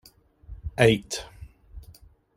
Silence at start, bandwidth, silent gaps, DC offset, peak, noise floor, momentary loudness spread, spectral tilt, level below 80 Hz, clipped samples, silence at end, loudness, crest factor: 0.5 s; 16.5 kHz; none; under 0.1%; -4 dBFS; -53 dBFS; 25 LU; -5 dB/octave; -46 dBFS; under 0.1%; 0.6 s; -24 LUFS; 24 dB